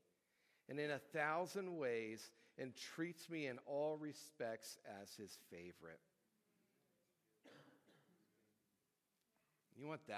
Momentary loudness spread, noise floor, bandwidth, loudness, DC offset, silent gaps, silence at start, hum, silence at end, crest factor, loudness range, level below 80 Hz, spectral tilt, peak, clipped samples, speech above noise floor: 18 LU; -88 dBFS; 16 kHz; -48 LUFS; under 0.1%; none; 0.7 s; none; 0 s; 22 dB; 18 LU; under -90 dBFS; -4.5 dB/octave; -28 dBFS; under 0.1%; 40 dB